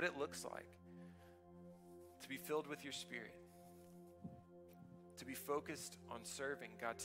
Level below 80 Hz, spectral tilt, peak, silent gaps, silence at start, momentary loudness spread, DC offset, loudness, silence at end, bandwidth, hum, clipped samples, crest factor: -80 dBFS; -3.5 dB/octave; -26 dBFS; none; 0 s; 17 LU; under 0.1%; -49 LUFS; 0 s; 16 kHz; none; under 0.1%; 24 dB